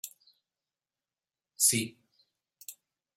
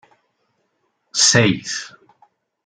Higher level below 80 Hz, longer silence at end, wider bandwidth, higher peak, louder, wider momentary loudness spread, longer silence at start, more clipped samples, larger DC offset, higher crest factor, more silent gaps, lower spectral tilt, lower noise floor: second, -82 dBFS vs -58 dBFS; second, 0.45 s vs 0.75 s; first, 16.5 kHz vs 10.5 kHz; second, -12 dBFS vs -2 dBFS; second, -27 LUFS vs -16 LUFS; first, 23 LU vs 16 LU; second, 0.05 s vs 1.15 s; neither; neither; first, 26 dB vs 20 dB; neither; about the same, -1.5 dB/octave vs -2.5 dB/octave; first, under -90 dBFS vs -69 dBFS